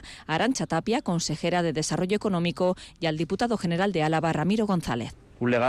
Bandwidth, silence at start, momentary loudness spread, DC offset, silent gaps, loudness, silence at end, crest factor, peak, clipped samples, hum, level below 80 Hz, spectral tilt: 13 kHz; 0.05 s; 5 LU; under 0.1%; none; -26 LUFS; 0 s; 12 dB; -14 dBFS; under 0.1%; none; -52 dBFS; -5.5 dB/octave